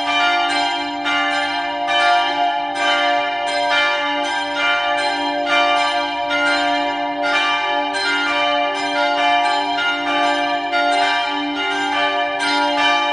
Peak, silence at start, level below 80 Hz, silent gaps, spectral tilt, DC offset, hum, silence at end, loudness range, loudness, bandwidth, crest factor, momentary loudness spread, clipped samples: -4 dBFS; 0 s; -58 dBFS; none; -1.5 dB/octave; under 0.1%; none; 0 s; 1 LU; -17 LUFS; 11 kHz; 14 dB; 4 LU; under 0.1%